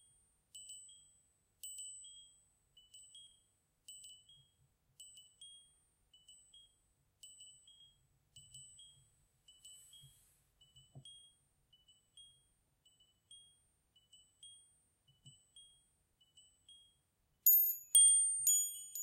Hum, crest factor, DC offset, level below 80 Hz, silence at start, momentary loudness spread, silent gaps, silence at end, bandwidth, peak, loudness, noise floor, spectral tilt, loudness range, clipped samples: none; 32 dB; under 0.1%; -84 dBFS; 0.55 s; 31 LU; none; 0 s; 16 kHz; -12 dBFS; -29 LUFS; -80 dBFS; 2.5 dB/octave; 30 LU; under 0.1%